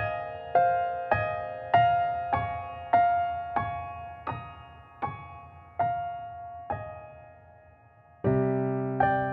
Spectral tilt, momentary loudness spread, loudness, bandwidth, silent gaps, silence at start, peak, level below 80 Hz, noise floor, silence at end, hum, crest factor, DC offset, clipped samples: -9.5 dB/octave; 18 LU; -29 LUFS; 4.6 kHz; none; 0 s; -8 dBFS; -54 dBFS; -56 dBFS; 0 s; none; 20 dB; under 0.1%; under 0.1%